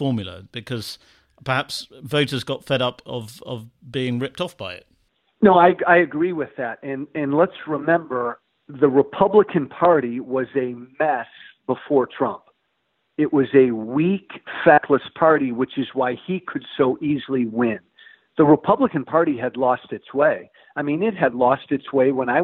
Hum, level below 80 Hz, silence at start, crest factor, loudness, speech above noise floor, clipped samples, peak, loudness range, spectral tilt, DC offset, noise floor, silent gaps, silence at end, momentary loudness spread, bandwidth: none; -62 dBFS; 0 s; 18 dB; -20 LUFS; 51 dB; under 0.1%; -2 dBFS; 6 LU; -7 dB/octave; under 0.1%; -71 dBFS; none; 0 s; 16 LU; 14 kHz